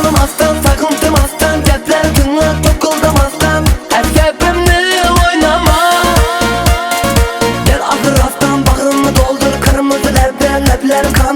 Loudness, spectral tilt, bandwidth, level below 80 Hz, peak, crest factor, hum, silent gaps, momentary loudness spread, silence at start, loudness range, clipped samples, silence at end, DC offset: -11 LUFS; -4.5 dB/octave; 19.5 kHz; -16 dBFS; 0 dBFS; 10 dB; none; none; 3 LU; 0 s; 1 LU; 0.2%; 0 s; under 0.1%